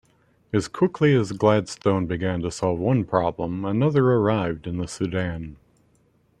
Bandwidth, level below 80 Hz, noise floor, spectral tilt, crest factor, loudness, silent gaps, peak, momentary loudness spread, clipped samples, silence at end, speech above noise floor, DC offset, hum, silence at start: 11 kHz; -52 dBFS; -62 dBFS; -7 dB/octave; 20 dB; -23 LUFS; none; -4 dBFS; 9 LU; under 0.1%; 0.85 s; 40 dB; under 0.1%; none; 0.55 s